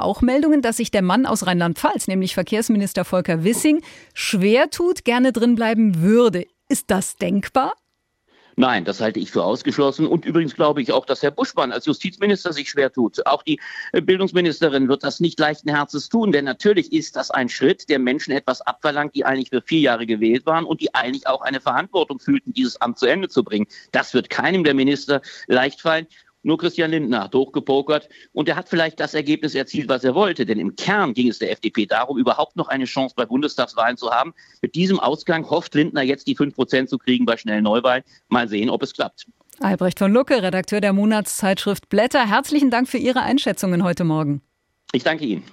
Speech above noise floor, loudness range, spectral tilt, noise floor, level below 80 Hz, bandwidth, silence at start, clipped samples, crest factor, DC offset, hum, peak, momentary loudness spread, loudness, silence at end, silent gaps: 50 dB; 3 LU; -5 dB/octave; -69 dBFS; -54 dBFS; 16 kHz; 0 s; under 0.1%; 16 dB; under 0.1%; none; -4 dBFS; 6 LU; -20 LUFS; 0.1 s; none